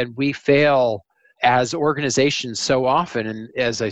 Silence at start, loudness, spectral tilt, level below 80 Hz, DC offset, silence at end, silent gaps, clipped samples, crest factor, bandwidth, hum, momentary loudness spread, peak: 0 s; -19 LUFS; -4.5 dB/octave; -56 dBFS; under 0.1%; 0 s; none; under 0.1%; 18 dB; 9.2 kHz; none; 8 LU; -2 dBFS